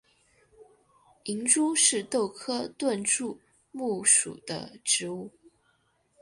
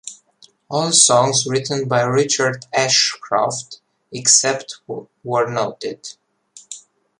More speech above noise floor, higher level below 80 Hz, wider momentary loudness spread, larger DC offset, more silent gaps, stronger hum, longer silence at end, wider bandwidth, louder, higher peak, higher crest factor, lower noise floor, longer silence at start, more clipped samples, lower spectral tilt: first, 42 dB vs 35 dB; second, -72 dBFS vs -64 dBFS; second, 18 LU vs 23 LU; neither; neither; neither; first, 0.9 s vs 0.4 s; second, 11.5 kHz vs 13.5 kHz; second, -26 LUFS vs -16 LUFS; second, -6 dBFS vs 0 dBFS; about the same, 24 dB vs 20 dB; first, -70 dBFS vs -53 dBFS; first, 0.6 s vs 0.05 s; neither; about the same, -1.5 dB/octave vs -2 dB/octave